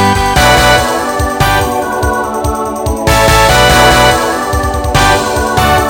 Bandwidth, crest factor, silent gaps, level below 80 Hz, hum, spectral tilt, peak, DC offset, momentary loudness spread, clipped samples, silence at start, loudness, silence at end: over 20 kHz; 10 dB; none; -20 dBFS; none; -3.5 dB/octave; 0 dBFS; under 0.1%; 8 LU; 0.5%; 0 s; -9 LUFS; 0 s